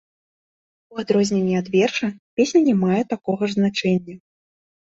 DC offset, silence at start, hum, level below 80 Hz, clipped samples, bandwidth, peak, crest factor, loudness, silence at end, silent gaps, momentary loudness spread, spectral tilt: under 0.1%; 0.9 s; none; -62 dBFS; under 0.1%; 7.8 kHz; -6 dBFS; 16 dB; -20 LUFS; 0.8 s; 2.19-2.37 s; 9 LU; -6 dB/octave